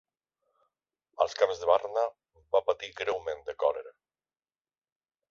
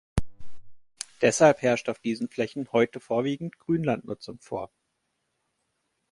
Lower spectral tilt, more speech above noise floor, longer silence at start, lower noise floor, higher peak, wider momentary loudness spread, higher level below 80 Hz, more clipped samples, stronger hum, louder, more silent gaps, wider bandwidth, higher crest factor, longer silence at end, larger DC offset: second, -2.5 dB/octave vs -5 dB/octave; first, over 61 dB vs 52 dB; first, 1.2 s vs 0.15 s; first, under -90 dBFS vs -77 dBFS; second, -10 dBFS vs -6 dBFS; second, 8 LU vs 18 LU; second, -68 dBFS vs -46 dBFS; neither; neither; second, -30 LUFS vs -26 LUFS; neither; second, 7.4 kHz vs 11.5 kHz; about the same, 22 dB vs 22 dB; about the same, 1.4 s vs 1.45 s; neither